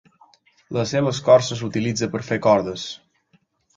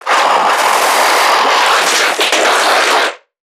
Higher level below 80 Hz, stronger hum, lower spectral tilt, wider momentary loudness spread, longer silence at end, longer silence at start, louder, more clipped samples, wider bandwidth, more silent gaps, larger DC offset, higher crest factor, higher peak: first, -56 dBFS vs -72 dBFS; neither; first, -5 dB/octave vs 1 dB/octave; first, 14 LU vs 1 LU; first, 0.8 s vs 0.35 s; first, 0.7 s vs 0 s; second, -21 LUFS vs -10 LUFS; neither; second, 7.8 kHz vs 19.5 kHz; neither; neither; first, 20 dB vs 12 dB; about the same, -2 dBFS vs 0 dBFS